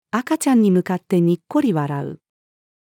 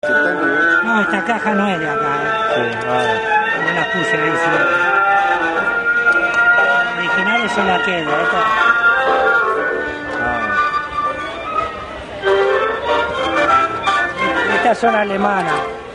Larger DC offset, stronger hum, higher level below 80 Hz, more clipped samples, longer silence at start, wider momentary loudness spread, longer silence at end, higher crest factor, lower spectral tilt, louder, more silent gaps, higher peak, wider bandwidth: neither; neither; second, -74 dBFS vs -46 dBFS; neither; about the same, 0.15 s vs 0.05 s; first, 10 LU vs 7 LU; first, 0.85 s vs 0 s; about the same, 14 dB vs 14 dB; first, -7 dB/octave vs -4.5 dB/octave; second, -19 LUFS vs -15 LUFS; neither; second, -6 dBFS vs -2 dBFS; first, 18 kHz vs 10.5 kHz